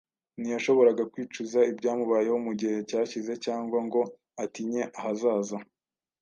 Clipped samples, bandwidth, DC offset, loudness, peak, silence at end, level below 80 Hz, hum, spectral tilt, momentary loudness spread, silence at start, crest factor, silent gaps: under 0.1%; 7.4 kHz; under 0.1%; -28 LUFS; -10 dBFS; 0.6 s; -80 dBFS; none; -5 dB/octave; 13 LU; 0.4 s; 18 dB; none